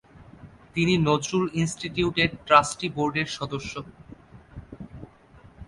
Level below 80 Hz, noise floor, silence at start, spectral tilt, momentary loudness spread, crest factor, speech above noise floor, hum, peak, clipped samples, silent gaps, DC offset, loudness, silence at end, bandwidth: -50 dBFS; -52 dBFS; 0.15 s; -5 dB/octave; 24 LU; 24 dB; 28 dB; none; -4 dBFS; under 0.1%; none; under 0.1%; -24 LUFS; 0.05 s; 11.5 kHz